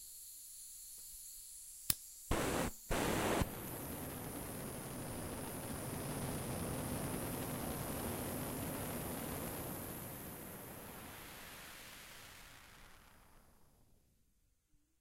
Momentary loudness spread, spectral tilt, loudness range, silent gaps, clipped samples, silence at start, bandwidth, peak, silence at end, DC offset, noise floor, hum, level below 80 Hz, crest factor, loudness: 13 LU; -4 dB/octave; 14 LU; none; under 0.1%; 0 s; 16 kHz; -12 dBFS; 1.15 s; under 0.1%; -76 dBFS; none; -54 dBFS; 32 dB; -43 LUFS